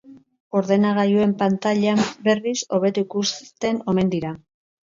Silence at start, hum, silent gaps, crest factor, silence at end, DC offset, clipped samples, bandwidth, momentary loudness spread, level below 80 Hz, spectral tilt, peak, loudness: 0.1 s; none; 0.40-0.51 s; 14 dB; 0.45 s; under 0.1%; under 0.1%; 7.6 kHz; 7 LU; -60 dBFS; -5.5 dB/octave; -6 dBFS; -21 LUFS